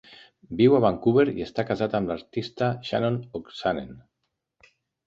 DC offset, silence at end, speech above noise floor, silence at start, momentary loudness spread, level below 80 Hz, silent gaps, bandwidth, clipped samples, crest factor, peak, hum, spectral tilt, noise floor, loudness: under 0.1%; 1.05 s; 56 dB; 0.1 s; 13 LU; -56 dBFS; none; 7.4 kHz; under 0.1%; 20 dB; -6 dBFS; none; -8 dB/octave; -80 dBFS; -25 LUFS